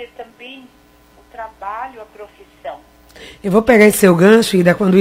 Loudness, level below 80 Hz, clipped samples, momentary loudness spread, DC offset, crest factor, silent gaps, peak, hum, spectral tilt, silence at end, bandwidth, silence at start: -11 LUFS; -48 dBFS; under 0.1%; 25 LU; under 0.1%; 16 dB; none; 0 dBFS; 60 Hz at -50 dBFS; -5.5 dB/octave; 0 s; 16.5 kHz; 0 s